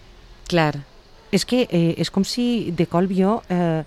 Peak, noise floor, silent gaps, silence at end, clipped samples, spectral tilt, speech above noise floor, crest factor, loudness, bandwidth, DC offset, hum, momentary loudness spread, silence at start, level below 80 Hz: -4 dBFS; -40 dBFS; none; 0 s; under 0.1%; -6 dB/octave; 20 dB; 16 dB; -21 LUFS; 13 kHz; under 0.1%; none; 4 LU; 0.3 s; -48 dBFS